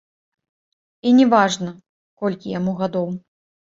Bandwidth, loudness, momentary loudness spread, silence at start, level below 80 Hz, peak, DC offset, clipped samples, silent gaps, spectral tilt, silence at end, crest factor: 7.8 kHz; -19 LUFS; 14 LU; 1.05 s; -64 dBFS; -2 dBFS; under 0.1%; under 0.1%; 1.89-2.17 s; -5.5 dB/octave; 0.5 s; 20 dB